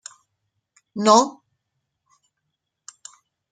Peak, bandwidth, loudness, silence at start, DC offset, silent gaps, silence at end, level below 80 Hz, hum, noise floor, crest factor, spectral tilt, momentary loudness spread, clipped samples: -2 dBFS; 9.6 kHz; -18 LUFS; 0.95 s; under 0.1%; none; 2.2 s; -76 dBFS; none; -79 dBFS; 24 dB; -3.5 dB/octave; 26 LU; under 0.1%